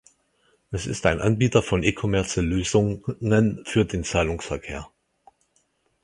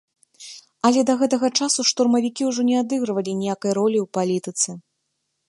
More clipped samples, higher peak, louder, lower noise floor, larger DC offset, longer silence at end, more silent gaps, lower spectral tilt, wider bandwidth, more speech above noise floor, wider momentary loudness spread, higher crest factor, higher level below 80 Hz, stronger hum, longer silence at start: neither; about the same, -2 dBFS vs -4 dBFS; about the same, -23 LUFS vs -21 LUFS; second, -68 dBFS vs -75 dBFS; neither; first, 1.15 s vs 0.7 s; neither; first, -5.5 dB/octave vs -3.5 dB/octave; about the same, 11.5 kHz vs 11.5 kHz; second, 45 dB vs 55 dB; first, 11 LU vs 7 LU; about the same, 22 dB vs 18 dB; first, -40 dBFS vs -70 dBFS; neither; first, 0.7 s vs 0.4 s